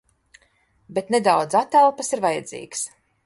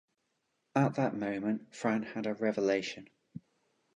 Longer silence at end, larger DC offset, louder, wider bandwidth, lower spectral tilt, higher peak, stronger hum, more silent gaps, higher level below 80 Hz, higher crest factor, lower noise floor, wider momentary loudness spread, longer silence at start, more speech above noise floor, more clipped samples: second, 0.4 s vs 0.55 s; neither; first, -21 LUFS vs -33 LUFS; first, 11.5 kHz vs 10 kHz; second, -3.5 dB/octave vs -6.5 dB/octave; first, -4 dBFS vs -14 dBFS; neither; neither; first, -68 dBFS vs -76 dBFS; about the same, 18 dB vs 20 dB; second, -62 dBFS vs -80 dBFS; second, 12 LU vs 21 LU; first, 0.9 s vs 0.75 s; second, 42 dB vs 48 dB; neither